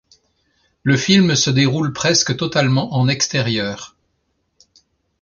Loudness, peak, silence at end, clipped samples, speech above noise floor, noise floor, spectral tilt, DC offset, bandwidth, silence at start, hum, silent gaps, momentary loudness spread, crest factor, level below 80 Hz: -16 LUFS; -2 dBFS; 1.35 s; under 0.1%; 52 dB; -68 dBFS; -4 dB/octave; under 0.1%; 7.4 kHz; 0.85 s; none; none; 10 LU; 16 dB; -52 dBFS